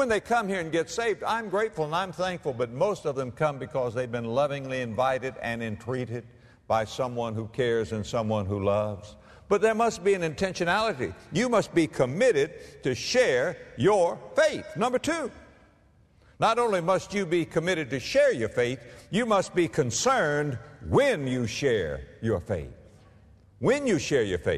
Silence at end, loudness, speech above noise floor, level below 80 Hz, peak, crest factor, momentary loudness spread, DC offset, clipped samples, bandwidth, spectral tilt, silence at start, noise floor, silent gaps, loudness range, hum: 0 s; -27 LUFS; 33 dB; -54 dBFS; -10 dBFS; 18 dB; 9 LU; under 0.1%; under 0.1%; 13.5 kHz; -5 dB/octave; 0 s; -60 dBFS; none; 4 LU; none